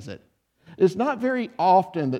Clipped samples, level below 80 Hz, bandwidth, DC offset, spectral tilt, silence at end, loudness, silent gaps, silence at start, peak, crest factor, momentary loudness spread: under 0.1%; -68 dBFS; 11 kHz; under 0.1%; -7.5 dB/octave; 0 s; -22 LUFS; none; 0 s; -8 dBFS; 16 dB; 7 LU